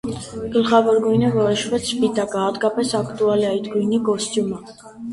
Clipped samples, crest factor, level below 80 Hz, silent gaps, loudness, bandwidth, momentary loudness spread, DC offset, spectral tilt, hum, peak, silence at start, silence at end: under 0.1%; 16 dB; -52 dBFS; none; -20 LUFS; 11.5 kHz; 9 LU; under 0.1%; -5 dB/octave; none; -4 dBFS; 0.05 s; 0 s